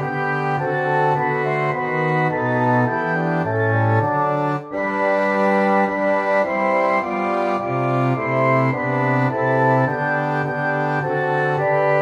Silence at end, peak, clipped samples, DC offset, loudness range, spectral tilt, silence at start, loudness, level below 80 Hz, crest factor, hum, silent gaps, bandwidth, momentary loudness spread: 0 s; -4 dBFS; under 0.1%; under 0.1%; 1 LU; -8.5 dB/octave; 0 s; -19 LUFS; -60 dBFS; 14 dB; none; none; 9.2 kHz; 4 LU